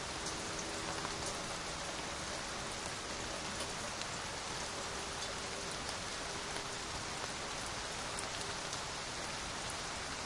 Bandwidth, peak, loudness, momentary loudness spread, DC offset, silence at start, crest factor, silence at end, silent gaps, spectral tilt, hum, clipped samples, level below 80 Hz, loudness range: 11.5 kHz; -22 dBFS; -40 LUFS; 1 LU; under 0.1%; 0 s; 20 dB; 0 s; none; -2 dB/octave; none; under 0.1%; -58 dBFS; 0 LU